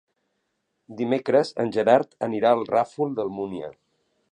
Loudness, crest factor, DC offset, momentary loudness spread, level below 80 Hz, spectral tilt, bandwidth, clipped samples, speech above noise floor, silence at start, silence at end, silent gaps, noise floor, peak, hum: -23 LUFS; 20 dB; under 0.1%; 12 LU; -68 dBFS; -6.5 dB/octave; 10 kHz; under 0.1%; 53 dB; 0.9 s; 0.6 s; none; -76 dBFS; -4 dBFS; none